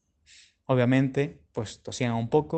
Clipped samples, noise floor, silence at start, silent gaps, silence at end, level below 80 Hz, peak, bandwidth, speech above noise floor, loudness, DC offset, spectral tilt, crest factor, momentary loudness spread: under 0.1%; -57 dBFS; 0.7 s; none; 0 s; -60 dBFS; -8 dBFS; 8.8 kHz; 32 dB; -27 LUFS; under 0.1%; -7 dB/octave; 18 dB; 13 LU